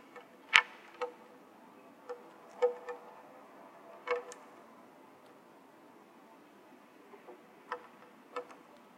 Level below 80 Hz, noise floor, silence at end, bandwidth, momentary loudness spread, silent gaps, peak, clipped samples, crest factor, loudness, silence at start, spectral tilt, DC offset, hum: -84 dBFS; -59 dBFS; 0.45 s; 16 kHz; 24 LU; none; 0 dBFS; under 0.1%; 40 dB; -34 LUFS; 0.15 s; -0.5 dB/octave; under 0.1%; none